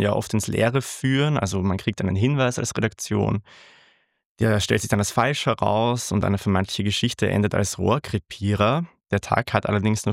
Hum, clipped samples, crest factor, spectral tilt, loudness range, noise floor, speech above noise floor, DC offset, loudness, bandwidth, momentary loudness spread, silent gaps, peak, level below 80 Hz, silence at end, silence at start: none; under 0.1%; 20 dB; -5 dB/octave; 2 LU; -59 dBFS; 37 dB; under 0.1%; -23 LUFS; 15.5 kHz; 4 LU; 4.26-4.35 s; -2 dBFS; -52 dBFS; 0 s; 0 s